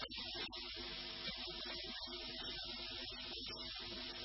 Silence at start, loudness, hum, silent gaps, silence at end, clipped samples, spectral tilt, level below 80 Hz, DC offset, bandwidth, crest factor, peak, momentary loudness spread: 0 s; -45 LUFS; none; none; 0 s; under 0.1%; -0.5 dB/octave; -62 dBFS; under 0.1%; 5.8 kHz; 16 dB; -30 dBFS; 1 LU